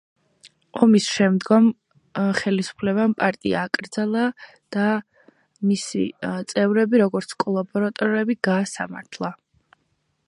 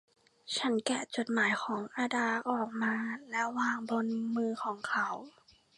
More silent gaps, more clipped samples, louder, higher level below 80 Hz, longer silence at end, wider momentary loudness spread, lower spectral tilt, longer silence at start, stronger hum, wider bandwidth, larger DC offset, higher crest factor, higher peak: neither; neither; first, -22 LUFS vs -33 LUFS; first, -64 dBFS vs -82 dBFS; first, 0.9 s vs 0.5 s; first, 13 LU vs 6 LU; first, -5.5 dB/octave vs -3.5 dB/octave; about the same, 0.45 s vs 0.45 s; neither; about the same, 11 kHz vs 11.5 kHz; neither; about the same, 20 dB vs 20 dB; first, -2 dBFS vs -14 dBFS